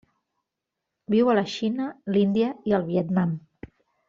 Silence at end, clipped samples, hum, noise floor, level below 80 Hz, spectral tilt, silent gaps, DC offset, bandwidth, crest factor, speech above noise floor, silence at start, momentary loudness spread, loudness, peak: 0.7 s; under 0.1%; none; -84 dBFS; -64 dBFS; -6.5 dB/octave; none; under 0.1%; 7.4 kHz; 18 dB; 61 dB; 1.1 s; 7 LU; -24 LUFS; -8 dBFS